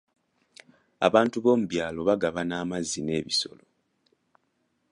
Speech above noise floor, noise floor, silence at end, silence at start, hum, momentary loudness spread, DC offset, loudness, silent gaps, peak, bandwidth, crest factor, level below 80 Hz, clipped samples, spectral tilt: 48 dB; -74 dBFS; 1.45 s; 1 s; none; 8 LU; under 0.1%; -26 LUFS; none; -4 dBFS; 11.5 kHz; 24 dB; -60 dBFS; under 0.1%; -4.5 dB/octave